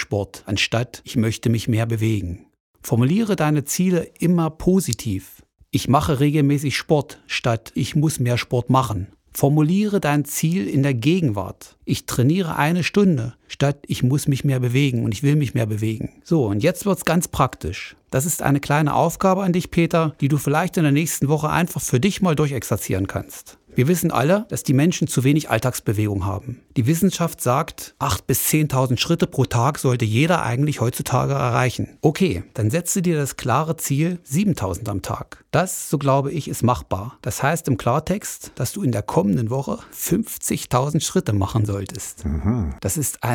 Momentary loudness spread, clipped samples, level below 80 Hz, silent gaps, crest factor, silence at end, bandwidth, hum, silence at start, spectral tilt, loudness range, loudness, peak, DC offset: 8 LU; under 0.1%; -44 dBFS; 2.60-2.74 s; 20 dB; 0 s; over 20 kHz; none; 0 s; -5.5 dB/octave; 3 LU; -21 LUFS; 0 dBFS; under 0.1%